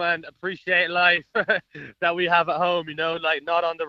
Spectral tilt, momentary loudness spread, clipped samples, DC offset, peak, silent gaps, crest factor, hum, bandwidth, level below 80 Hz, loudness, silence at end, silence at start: -5.5 dB/octave; 8 LU; under 0.1%; under 0.1%; -4 dBFS; none; 18 dB; none; 6.6 kHz; -66 dBFS; -22 LUFS; 0 s; 0 s